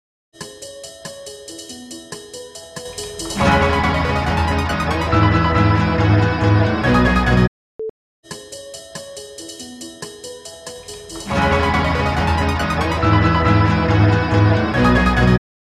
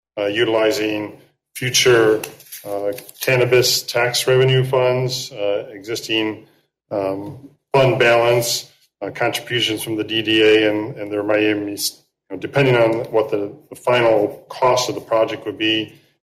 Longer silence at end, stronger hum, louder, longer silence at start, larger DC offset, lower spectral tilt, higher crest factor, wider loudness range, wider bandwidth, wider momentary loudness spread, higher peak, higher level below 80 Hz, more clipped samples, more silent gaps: about the same, 0.25 s vs 0.35 s; neither; about the same, -16 LUFS vs -18 LUFS; first, 0.4 s vs 0.15 s; neither; first, -6 dB/octave vs -4 dB/octave; about the same, 16 dB vs 14 dB; first, 15 LU vs 3 LU; second, 13.5 kHz vs 16 kHz; first, 18 LU vs 14 LU; about the same, -2 dBFS vs -4 dBFS; first, -28 dBFS vs -58 dBFS; neither; first, 7.48-7.79 s, 7.90-8.23 s vs none